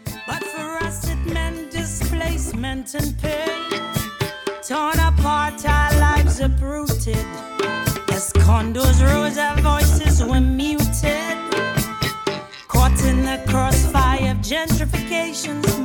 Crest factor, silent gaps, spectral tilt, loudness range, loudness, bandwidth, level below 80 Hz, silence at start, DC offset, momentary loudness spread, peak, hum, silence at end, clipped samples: 14 dB; none; -5 dB/octave; 7 LU; -20 LUFS; 19 kHz; -22 dBFS; 0.05 s; under 0.1%; 10 LU; -4 dBFS; none; 0 s; under 0.1%